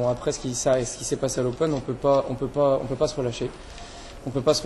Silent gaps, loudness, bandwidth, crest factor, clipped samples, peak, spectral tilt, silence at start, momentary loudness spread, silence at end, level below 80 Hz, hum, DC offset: none; -25 LUFS; 12.5 kHz; 18 dB; under 0.1%; -8 dBFS; -5 dB/octave; 0 s; 14 LU; 0 s; -44 dBFS; none; under 0.1%